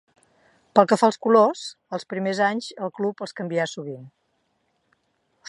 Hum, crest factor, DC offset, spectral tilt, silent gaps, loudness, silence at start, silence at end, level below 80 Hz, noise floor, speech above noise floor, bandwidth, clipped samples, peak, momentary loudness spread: none; 22 dB; under 0.1%; -5 dB/octave; none; -22 LUFS; 0.75 s; 1.4 s; -78 dBFS; -71 dBFS; 49 dB; 11.5 kHz; under 0.1%; -2 dBFS; 16 LU